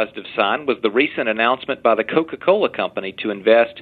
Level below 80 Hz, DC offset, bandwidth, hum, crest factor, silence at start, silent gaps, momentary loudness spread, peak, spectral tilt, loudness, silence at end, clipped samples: -64 dBFS; under 0.1%; 4.6 kHz; none; 18 dB; 0 s; none; 8 LU; 0 dBFS; -7.5 dB/octave; -19 LUFS; 0 s; under 0.1%